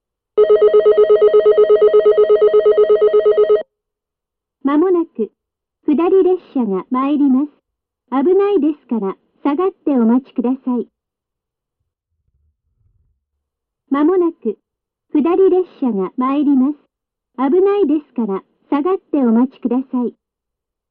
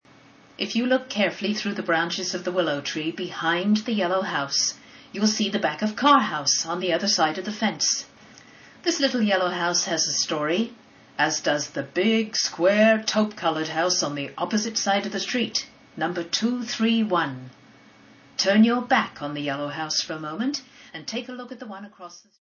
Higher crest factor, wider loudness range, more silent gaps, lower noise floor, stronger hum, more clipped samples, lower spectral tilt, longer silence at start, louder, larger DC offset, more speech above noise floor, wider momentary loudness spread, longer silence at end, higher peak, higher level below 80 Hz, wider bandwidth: second, 12 dB vs 20 dB; first, 10 LU vs 3 LU; neither; first, -83 dBFS vs -52 dBFS; neither; neither; first, -10.5 dB/octave vs -3 dB/octave; second, 0.35 s vs 0.6 s; first, -15 LUFS vs -24 LUFS; neither; first, 67 dB vs 28 dB; about the same, 12 LU vs 13 LU; first, 0.8 s vs 0.25 s; about the same, -4 dBFS vs -6 dBFS; first, -60 dBFS vs -72 dBFS; second, 4.2 kHz vs 7.2 kHz